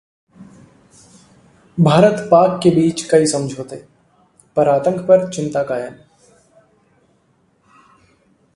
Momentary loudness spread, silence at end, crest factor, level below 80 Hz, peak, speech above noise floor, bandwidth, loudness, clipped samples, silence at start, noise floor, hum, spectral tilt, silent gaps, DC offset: 18 LU; 2.6 s; 18 dB; -56 dBFS; 0 dBFS; 45 dB; 11.5 kHz; -15 LUFS; under 0.1%; 0.4 s; -59 dBFS; none; -6 dB/octave; none; under 0.1%